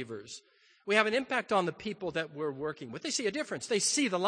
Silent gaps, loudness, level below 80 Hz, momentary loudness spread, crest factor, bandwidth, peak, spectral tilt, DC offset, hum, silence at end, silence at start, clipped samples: none; -31 LUFS; -72 dBFS; 15 LU; 24 dB; 10 kHz; -8 dBFS; -2.5 dB/octave; under 0.1%; none; 0 s; 0 s; under 0.1%